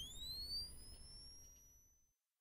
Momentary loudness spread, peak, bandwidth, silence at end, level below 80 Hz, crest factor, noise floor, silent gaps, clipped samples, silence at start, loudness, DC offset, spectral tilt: 21 LU; -38 dBFS; 16 kHz; 0.35 s; -62 dBFS; 16 dB; -79 dBFS; none; under 0.1%; 0 s; -49 LUFS; under 0.1%; -1.5 dB/octave